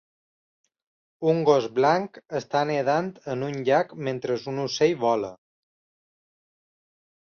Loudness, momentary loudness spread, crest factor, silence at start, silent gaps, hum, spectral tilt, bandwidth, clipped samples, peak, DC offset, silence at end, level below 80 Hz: -25 LUFS; 10 LU; 22 dB; 1.2 s; none; none; -5.5 dB/octave; 7 kHz; under 0.1%; -6 dBFS; under 0.1%; 2.05 s; -70 dBFS